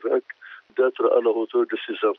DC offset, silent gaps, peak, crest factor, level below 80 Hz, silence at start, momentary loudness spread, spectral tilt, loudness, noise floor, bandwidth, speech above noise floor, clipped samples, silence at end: under 0.1%; none; -8 dBFS; 14 dB; -88 dBFS; 0.05 s; 15 LU; -1 dB/octave; -23 LUFS; -43 dBFS; 4.1 kHz; 21 dB; under 0.1%; 0.05 s